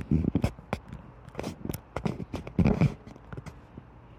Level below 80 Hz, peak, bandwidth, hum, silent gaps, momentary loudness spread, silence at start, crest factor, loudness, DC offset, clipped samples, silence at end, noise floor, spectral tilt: -42 dBFS; -12 dBFS; 15.5 kHz; none; none; 20 LU; 0 s; 18 dB; -31 LUFS; under 0.1%; under 0.1%; 0.05 s; -49 dBFS; -8 dB/octave